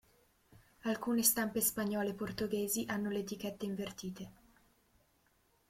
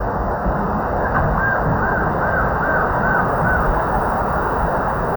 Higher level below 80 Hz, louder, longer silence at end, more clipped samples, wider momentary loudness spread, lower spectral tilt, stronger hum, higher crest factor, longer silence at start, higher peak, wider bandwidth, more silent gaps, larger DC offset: second, -68 dBFS vs -28 dBFS; second, -36 LUFS vs -18 LUFS; first, 1.4 s vs 0 s; neither; first, 14 LU vs 3 LU; second, -3.5 dB/octave vs -9 dB/octave; neither; first, 22 dB vs 12 dB; first, 0.85 s vs 0 s; second, -16 dBFS vs -6 dBFS; second, 16.5 kHz vs over 20 kHz; neither; neither